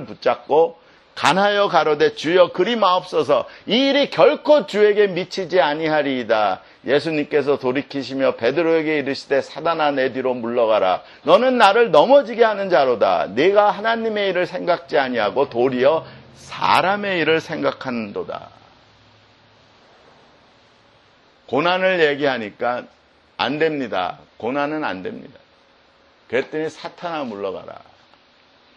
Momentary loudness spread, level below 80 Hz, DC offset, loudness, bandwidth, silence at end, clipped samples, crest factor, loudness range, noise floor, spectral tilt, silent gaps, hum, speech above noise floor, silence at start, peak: 12 LU; -64 dBFS; under 0.1%; -19 LUFS; 11.5 kHz; 1 s; under 0.1%; 20 dB; 11 LU; -54 dBFS; -5 dB/octave; none; none; 36 dB; 0 s; 0 dBFS